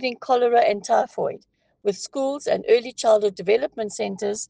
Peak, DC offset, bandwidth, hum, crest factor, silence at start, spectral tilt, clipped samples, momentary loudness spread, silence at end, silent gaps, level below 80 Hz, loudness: -6 dBFS; under 0.1%; 9.8 kHz; none; 16 dB; 0 s; -3.5 dB/octave; under 0.1%; 10 LU; 0.05 s; none; -70 dBFS; -22 LUFS